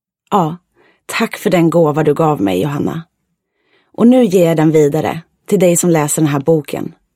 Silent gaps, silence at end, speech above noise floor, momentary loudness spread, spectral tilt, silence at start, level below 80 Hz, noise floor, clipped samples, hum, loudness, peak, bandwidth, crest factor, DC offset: none; 0.25 s; 56 dB; 11 LU; -6 dB/octave; 0.3 s; -54 dBFS; -68 dBFS; under 0.1%; none; -13 LUFS; 0 dBFS; 16.5 kHz; 14 dB; under 0.1%